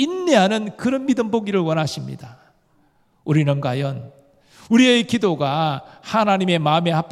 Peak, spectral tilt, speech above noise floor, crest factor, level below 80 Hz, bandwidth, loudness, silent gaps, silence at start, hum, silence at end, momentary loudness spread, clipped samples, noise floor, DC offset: -2 dBFS; -6 dB/octave; 41 dB; 18 dB; -64 dBFS; 13 kHz; -19 LUFS; none; 0 s; none; 0 s; 13 LU; under 0.1%; -60 dBFS; under 0.1%